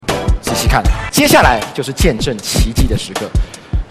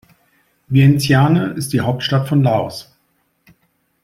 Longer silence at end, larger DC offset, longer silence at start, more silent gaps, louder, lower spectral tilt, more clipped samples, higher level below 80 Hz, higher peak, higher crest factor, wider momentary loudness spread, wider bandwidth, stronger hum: second, 0.05 s vs 1.2 s; neither; second, 0.05 s vs 0.7 s; neither; about the same, -14 LUFS vs -15 LUFS; second, -4.5 dB/octave vs -6.5 dB/octave; neither; first, -18 dBFS vs -50 dBFS; about the same, 0 dBFS vs -2 dBFS; about the same, 14 dB vs 16 dB; first, 11 LU vs 8 LU; about the same, 15.5 kHz vs 15 kHz; neither